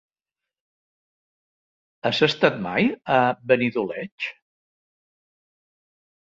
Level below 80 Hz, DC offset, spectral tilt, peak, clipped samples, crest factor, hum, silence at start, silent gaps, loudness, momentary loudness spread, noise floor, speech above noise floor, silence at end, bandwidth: -66 dBFS; under 0.1%; -6 dB/octave; -2 dBFS; under 0.1%; 24 dB; none; 2.05 s; 4.12-4.18 s; -22 LUFS; 11 LU; -89 dBFS; 67 dB; 1.9 s; 7.8 kHz